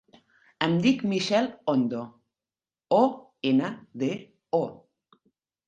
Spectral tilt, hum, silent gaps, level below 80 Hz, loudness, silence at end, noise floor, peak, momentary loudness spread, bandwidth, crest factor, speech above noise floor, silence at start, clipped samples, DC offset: -6 dB/octave; none; none; -70 dBFS; -26 LUFS; 0.95 s; under -90 dBFS; -6 dBFS; 12 LU; 9 kHz; 22 dB; over 65 dB; 0.6 s; under 0.1%; under 0.1%